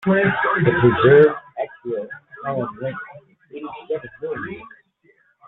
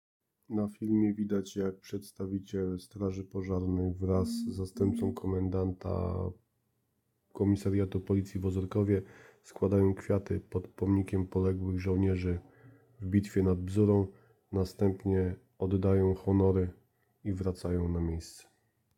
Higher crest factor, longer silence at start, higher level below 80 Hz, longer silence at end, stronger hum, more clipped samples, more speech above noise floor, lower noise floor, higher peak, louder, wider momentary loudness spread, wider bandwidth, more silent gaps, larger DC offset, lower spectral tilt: about the same, 18 dB vs 18 dB; second, 0 s vs 0.5 s; about the same, -54 dBFS vs -54 dBFS; first, 0.8 s vs 0.55 s; neither; neither; second, 43 dB vs 47 dB; second, -59 dBFS vs -78 dBFS; first, -2 dBFS vs -14 dBFS; first, -19 LUFS vs -32 LUFS; first, 22 LU vs 10 LU; second, 4.1 kHz vs 12.5 kHz; neither; neither; first, -10 dB/octave vs -8.5 dB/octave